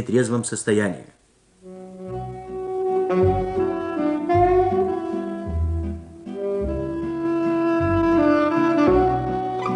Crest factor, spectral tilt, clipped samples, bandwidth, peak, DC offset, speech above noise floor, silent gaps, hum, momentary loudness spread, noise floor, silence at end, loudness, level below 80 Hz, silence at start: 16 dB; -6.5 dB/octave; under 0.1%; 10.5 kHz; -6 dBFS; under 0.1%; 33 dB; none; none; 15 LU; -54 dBFS; 0 s; -22 LUFS; -38 dBFS; 0 s